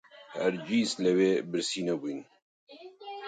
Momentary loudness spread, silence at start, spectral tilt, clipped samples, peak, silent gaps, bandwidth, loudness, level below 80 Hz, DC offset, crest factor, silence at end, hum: 18 LU; 0.15 s; -4.5 dB/octave; under 0.1%; -14 dBFS; 2.42-2.67 s; 9.4 kHz; -29 LUFS; -78 dBFS; under 0.1%; 18 dB; 0 s; none